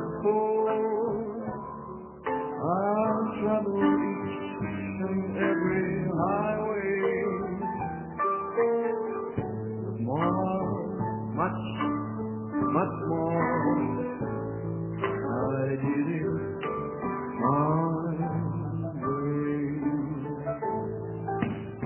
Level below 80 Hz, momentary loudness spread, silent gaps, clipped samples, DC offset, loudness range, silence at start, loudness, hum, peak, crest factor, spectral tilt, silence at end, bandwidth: -56 dBFS; 8 LU; none; under 0.1%; under 0.1%; 2 LU; 0 s; -29 LUFS; none; -10 dBFS; 18 dB; -7.5 dB/octave; 0 s; 3.2 kHz